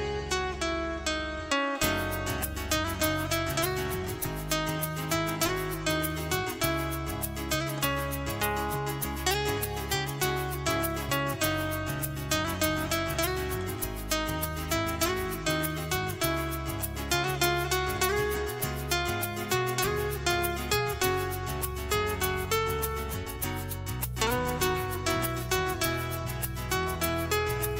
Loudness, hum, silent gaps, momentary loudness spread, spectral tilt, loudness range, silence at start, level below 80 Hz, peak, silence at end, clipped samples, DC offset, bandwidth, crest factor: -29 LUFS; none; none; 5 LU; -3.5 dB/octave; 1 LU; 0 s; -42 dBFS; -8 dBFS; 0 s; under 0.1%; under 0.1%; 16.5 kHz; 22 dB